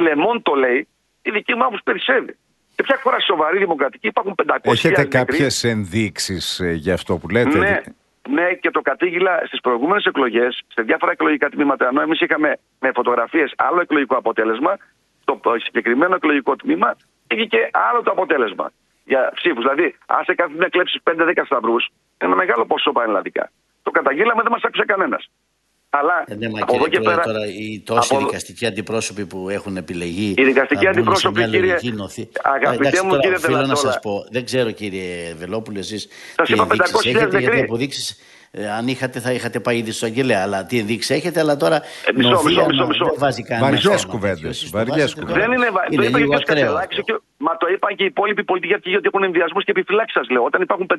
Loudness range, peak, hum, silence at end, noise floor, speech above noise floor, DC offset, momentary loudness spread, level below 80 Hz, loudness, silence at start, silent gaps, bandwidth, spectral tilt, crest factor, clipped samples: 3 LU; 0 dBFS; none; 0 s; -66 dBFS; 48 dB; under 0.1%; 9 LU; -54 dBFS; -18 LUFS; 0 s; none; 12 kHz; -4.5 dB/octave; 18 dB; under 0.1%